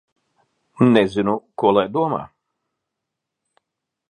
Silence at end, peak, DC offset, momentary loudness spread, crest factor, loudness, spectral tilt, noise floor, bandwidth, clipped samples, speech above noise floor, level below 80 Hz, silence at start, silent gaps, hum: 1.85 s; 0 dBFS; under 0.1%; 8 LU; 22 dB; -19 LUFS; -7.5 dB/octave; -82 dBFS; 9.8 kHz; under 0.1%; 64 dB; -58 dBFS; 0.8 s; none; none